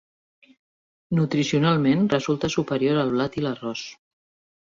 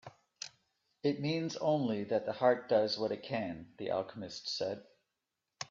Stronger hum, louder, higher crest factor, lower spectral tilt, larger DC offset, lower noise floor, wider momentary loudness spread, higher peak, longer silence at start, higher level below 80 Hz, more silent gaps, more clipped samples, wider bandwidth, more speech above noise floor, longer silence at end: neither; first, -23 LUFS vs -35 LUFS; about the same, 18 dB vs 22 dB; about the same, -6 dB/octave vs -5.5 dB/octave; neither; about the same, under -90 dBFS vs -88 dBFS; second, 11 LU vs 16 LU; first, -6 dBFS vs -14 dBFS; first, 1.1 s vs 0.05 s; first, -58 dBFS vs -76 dBFS; neither; neither; about the same, 7.6 kHz vs 7.6 kHz; first, over 68 dB vs 54 dB; first, 0.85 s vs 0.05 s